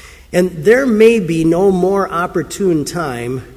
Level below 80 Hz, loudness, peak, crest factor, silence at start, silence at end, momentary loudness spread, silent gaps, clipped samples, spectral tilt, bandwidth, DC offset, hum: -42 dBFS; -14 LUFS; 0 dBFS; 14 dB; 0.05 s; 0 s; 10 LU; none; under 0.1%; -6 dB/octave; 16 kHz; under 0.1%; none